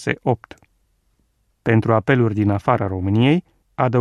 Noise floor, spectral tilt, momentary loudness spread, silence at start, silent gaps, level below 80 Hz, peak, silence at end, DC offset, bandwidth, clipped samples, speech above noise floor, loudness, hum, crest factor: -65 dBFS; -8 dB/octave; 8 LU; 0 s; none; -52 dBFS; -2 dBFS; 0 s; under 0.1%; 9.4 kHz; under 0.1%; 47 dB; -19 LUFS; none; 18 dB